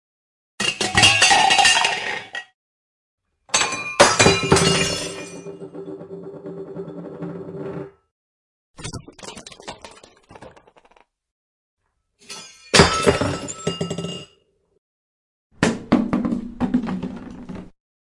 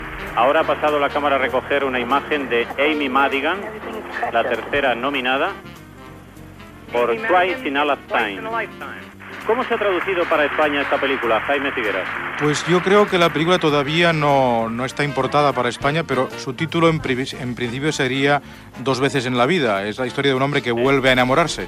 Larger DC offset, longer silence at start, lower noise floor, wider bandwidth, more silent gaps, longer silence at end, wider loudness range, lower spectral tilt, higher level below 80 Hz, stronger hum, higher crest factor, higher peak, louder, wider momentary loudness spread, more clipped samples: neither; first, 0.6 s vs 0 s; first, -61 dBFS vs -39 dBFS; second, 11.5 kHz vs 15 kHz; first, 2.54-3.18 s, 8.11-8.74 s, 11.31-11.77 s, 14.78-15.50 s vs none; first, 0.4 s vs 0 s; first, 20 LU vs 4 LU; second, -3 dB/octave vs -5 dB/octave; about the same, -46 dBFS vs -48 dBFS; neither; first, 22 dB vs 16 dB; first, 0 dBFS vs -4 dBFS; about the same, -17 LUFS vs -19 LUFS; first, 24 LU vs 9 LU; neither